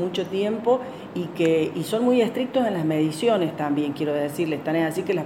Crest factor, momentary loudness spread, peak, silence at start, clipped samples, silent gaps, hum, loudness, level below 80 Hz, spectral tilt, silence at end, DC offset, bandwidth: 14 dB; 5 LU; -8 dBFS; 0 s; under 0.1%; none; none; -23 LUFS; -68 dBFS; -6 dB/octave; 0 s; under 0.1%; 17 kHz